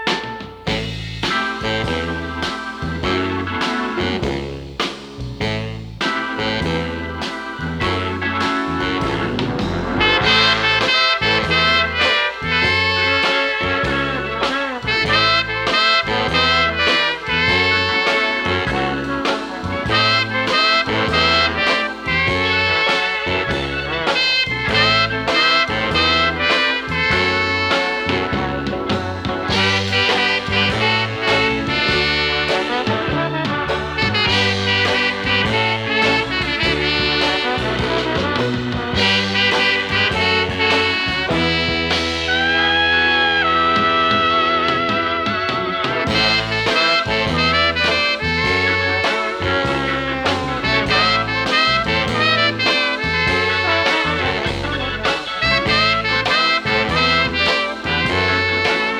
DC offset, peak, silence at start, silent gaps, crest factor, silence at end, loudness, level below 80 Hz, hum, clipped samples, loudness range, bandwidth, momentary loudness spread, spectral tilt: under 0.1%; -2 dBFS; 0 s; none; 16 dB; 0 s; -16 LUFS; -38 dBFS; none; under 0.1%; 6 LU; 19 kHz; 7 LU; -4 dB/octave